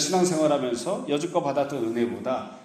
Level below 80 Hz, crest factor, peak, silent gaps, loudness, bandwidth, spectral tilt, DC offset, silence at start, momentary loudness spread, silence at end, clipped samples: -68 dBFS; 16 dB; -10 dBFS; none; -26 LUFS; 14.5 kHz; -4.5 dB/octave; under 0.1%; 0 s; 7 LU; 0 s; under 0.1%